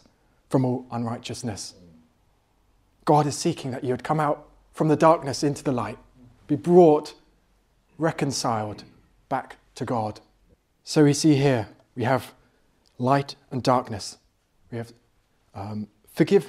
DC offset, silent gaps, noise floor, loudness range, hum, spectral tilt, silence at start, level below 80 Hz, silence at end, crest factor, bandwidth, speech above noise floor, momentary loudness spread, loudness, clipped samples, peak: under 0.1%; none; -65 dBFS; 7 LU; none; -6 dB/octave; 0.5 s; -62 dBFS; 0 s; 22 dB; 15 kHz; 42 dB; 19 LU; -24 LUFS; under 0.1%; -4 dBFS